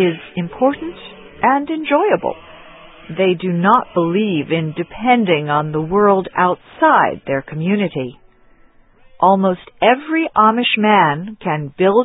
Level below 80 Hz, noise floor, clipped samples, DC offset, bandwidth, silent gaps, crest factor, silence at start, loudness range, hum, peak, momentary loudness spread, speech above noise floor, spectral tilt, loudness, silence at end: -52 dBFS; -48 dBFS; under 0.1%; under 0.1%; 4 kHz; none; 16 dB; 0 s; 3 LU; none; 0 dBFS; 12 LU; 33 dB; -10 dB/octave; -16 LUFS; 0 s